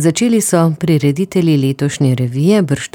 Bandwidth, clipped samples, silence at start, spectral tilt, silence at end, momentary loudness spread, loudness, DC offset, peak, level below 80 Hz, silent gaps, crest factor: 18.5 kHz; under 0.1%; 0 s; -6 dB/octave; 0.05 s; 3 LU; -14 LUFS; under 0.1%; -2 dBFS; -52 dBFS; none; 12 dB